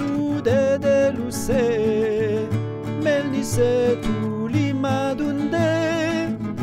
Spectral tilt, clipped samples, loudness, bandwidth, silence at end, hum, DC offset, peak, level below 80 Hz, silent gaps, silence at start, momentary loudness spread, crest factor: -6 dB/octave; under 0.1%; -21 LUFS; 16 kHz; 0 s; none; under 0.1%; -8 dBFS; -44 dBFS; none; 0 s; 6 LU; 14 dB